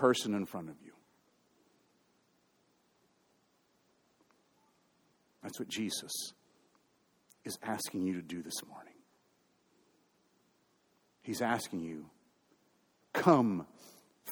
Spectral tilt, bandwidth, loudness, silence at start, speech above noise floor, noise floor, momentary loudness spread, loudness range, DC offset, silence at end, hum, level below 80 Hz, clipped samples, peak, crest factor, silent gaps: -4.5 dB/octave; over 20 kHz; -35 LUFS; 0 s; 39 dB; -74 dBFS; 22 LU; 13 LU; under 0.1%; 0 s; none; -80 dBFS; under 0.1%; -10 dBFS; 28 dB; none